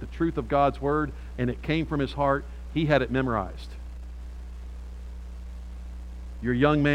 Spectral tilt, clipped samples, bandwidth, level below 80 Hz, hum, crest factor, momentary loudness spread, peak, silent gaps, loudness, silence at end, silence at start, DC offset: -8 dB/octave; under 0.1%; 10.5 kHz; -38 dBFS; none; 20 dB; 18 LU; -8 dBFS; none; -26 LUFS; 0 s; 0 s; under 0.1%